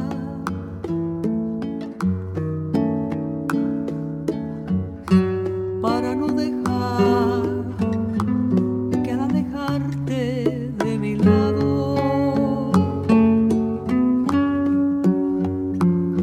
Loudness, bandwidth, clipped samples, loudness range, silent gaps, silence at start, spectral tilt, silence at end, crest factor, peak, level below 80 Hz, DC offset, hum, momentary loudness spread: -21 LUFS; 13 kHz; under 0.1%; 5 LU; none; 0 s; -8.5 dB/octave; 0 s; 18 dB; -2 dBFS; -46 dBFS; under 0.1%; none; 8 LU